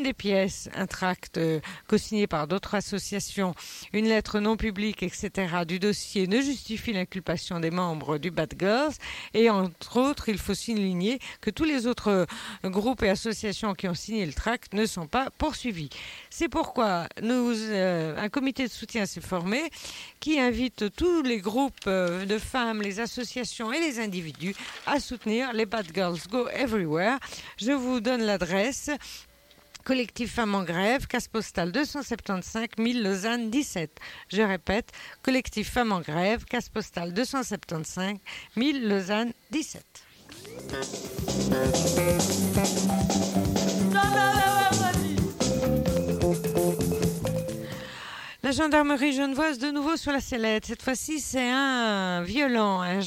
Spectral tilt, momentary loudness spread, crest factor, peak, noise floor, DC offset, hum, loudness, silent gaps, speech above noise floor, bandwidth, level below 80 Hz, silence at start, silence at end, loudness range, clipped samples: -4.5 dB/octave; 9 LU; 18 dB; -8 dBFS; -56 dBFS; under 0.1%; none; -27 LUFS; none; 28 dB; 17 kHz; -48 dBFS; 0 s; 0 s; 5 LU; under 0.1%